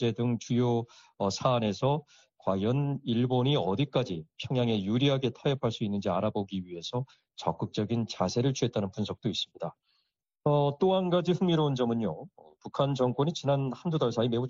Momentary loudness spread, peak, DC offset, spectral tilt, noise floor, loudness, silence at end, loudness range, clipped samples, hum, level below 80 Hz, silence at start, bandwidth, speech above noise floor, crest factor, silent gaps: 9 LU; -12 dBFS; under 0.1%; -6 dB/octave; -78 dBFS; -30 LUFS; 0 s; 3 LU; under 0.1%; none; -64 dBFS; 0 s; 7.6 kHz; 49 dB; 18 dB; none